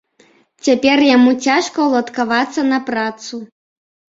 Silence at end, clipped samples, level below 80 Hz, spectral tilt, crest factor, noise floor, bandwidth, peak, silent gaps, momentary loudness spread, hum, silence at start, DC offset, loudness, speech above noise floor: 0.7 s; under 0.1%; -60 dBFS; -3 dB/octave; 16 dB; -53 dBFS; 7.8 kHz; 0 dBFS; none; 12 LU; none; 0.65 s; under 0.1%; -15 LUFS; 38 dB